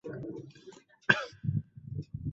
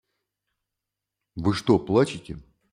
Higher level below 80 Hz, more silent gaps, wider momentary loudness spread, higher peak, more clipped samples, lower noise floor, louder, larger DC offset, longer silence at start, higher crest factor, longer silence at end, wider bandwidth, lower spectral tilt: about the same, -56 dBFS vs -54 dBFS; neither; about the same, 19 LU vs 21 LU; about the same, -6 dBFS vs -6 dBFS; neither; second, -55 dBFS vs -86 dBFS; second, -33 LUFS vs -23 LUFS; neither; second, 0.05 s vs 1.35 s; first, 30 dB vs 20 dB; second, 0 s vs 0.3 s; second, 7.8 kHz vs 12 kHz; second, -4 dB/octave vs -6.5 dB/octave